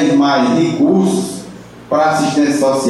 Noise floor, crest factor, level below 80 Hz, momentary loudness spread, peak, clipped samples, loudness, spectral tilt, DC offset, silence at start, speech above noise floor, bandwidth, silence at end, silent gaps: -33 dBFS; 10 dB; -54 dBFS; 11 LU; -4 dBFS; under 0.1%; -13 LUFS; -5.5 dB/octave; under 0.1%; 0 s; 21 dB; 12.5 kHz; 0 s; none